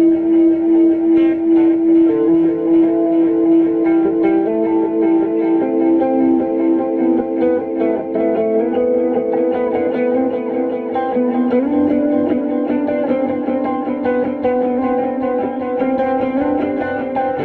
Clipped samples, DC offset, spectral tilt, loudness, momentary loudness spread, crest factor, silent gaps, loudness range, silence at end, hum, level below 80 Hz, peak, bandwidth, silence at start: under 0.1%; under 0.1%; -10 dB/octave; -16 LUFS; 6 LU; 10 dB; none; 5 LU; 0 s; none; -52 dBFS; -4 dBFS; 3.7 kHz; 0 s